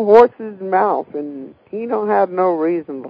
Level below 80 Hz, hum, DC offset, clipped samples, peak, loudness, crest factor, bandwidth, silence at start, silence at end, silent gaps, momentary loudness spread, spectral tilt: -60 dBFS; none; under 0.1%; 0.2%; 0 dBFS; -17 LUFS; 16 dB; 5.4 kHz; 0 s; 0 s; none; 17 LU; -8 dB/octave